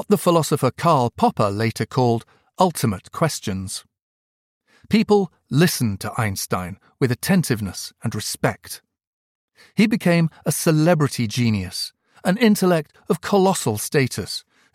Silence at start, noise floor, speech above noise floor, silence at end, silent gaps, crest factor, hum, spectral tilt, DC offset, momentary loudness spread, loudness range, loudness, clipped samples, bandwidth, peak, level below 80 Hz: 0 s; under -90 dBFS; over 70 dB; 0.35 s; 4.02-4.61 s, 9.07-9.48 s; 18 dB; none; -5.5 dB/octave; under 0.1%; 11 LU; 4 LU; -21 LUFS; under 0.1%; 16.5 kHz; -4 dBFS; -56 dBFS